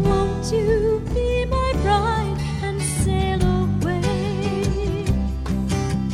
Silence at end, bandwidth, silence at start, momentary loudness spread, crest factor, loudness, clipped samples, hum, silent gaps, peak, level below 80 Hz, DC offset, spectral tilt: 0 s; 14.5 kHz; 0 s; 5 LU; 14 dB; -22 LUFS; under 0.1%; none; none; -6 dBFS; -28 dBFS; under 0.1%; -6 dB/octave